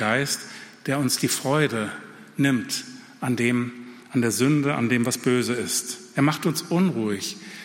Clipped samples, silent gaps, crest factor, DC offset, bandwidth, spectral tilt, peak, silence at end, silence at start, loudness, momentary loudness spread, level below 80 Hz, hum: under 0.1%; none; 16 dB; under 0.1%; 16.5 kHz; -4.5 dB/octave; -8 dBFS; 0 s; 0 s; -24 LUFS; 11 LU; -66 dBFS; none